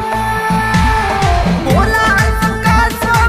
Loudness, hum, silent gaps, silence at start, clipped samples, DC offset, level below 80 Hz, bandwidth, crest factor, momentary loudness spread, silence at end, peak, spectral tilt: -13 LUFS; none; none; 0 s; under 0.1%; 0.6%; -20 dBFS; 15.5 kHz; 12 dB; 4 LU; 0 s; 0 dBFS; -5.5 dB/octave